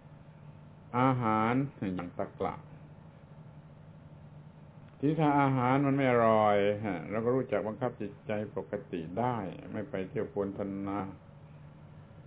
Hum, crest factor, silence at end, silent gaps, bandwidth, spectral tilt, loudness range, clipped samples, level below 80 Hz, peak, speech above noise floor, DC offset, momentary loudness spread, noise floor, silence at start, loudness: none; 22 dB; 0.05 s; none; 4 kHz; -6.5 dB/octave; 9 LU; under 0.1%; -62 dBFS; -12 dBFS; 22 dB; under 0.1%; 25 LU; -52 dBFS; 0.05 s; -31 LUFS